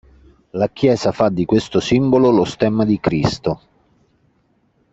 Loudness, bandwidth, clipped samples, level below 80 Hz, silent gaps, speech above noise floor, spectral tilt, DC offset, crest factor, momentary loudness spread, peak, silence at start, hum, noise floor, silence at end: -17 LUFS; 8.2 kHz; under 0.1%; -46 dBFS; none; 45 dB; -7 dB/octave; under 0.1%; 16 dB; 10 LU; -2 dBFS; 0.55 s; none; -61 dBFS; 1.35 s